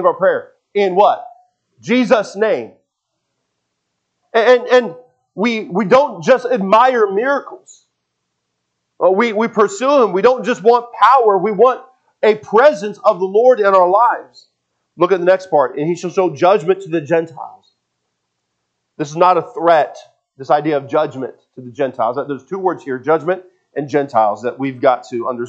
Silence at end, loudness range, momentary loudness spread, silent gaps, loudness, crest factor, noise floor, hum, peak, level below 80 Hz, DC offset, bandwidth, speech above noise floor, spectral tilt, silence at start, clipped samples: 0 s; 6 LU; 13 LU; none; -15 LUFS; 16 dB; -73 dBFS; none; 0 dBFS; -70 dBFS; under 0.1%; 8.2 kHz; 59 dB; -5.5 dB/octave; 0 s; under 0.1%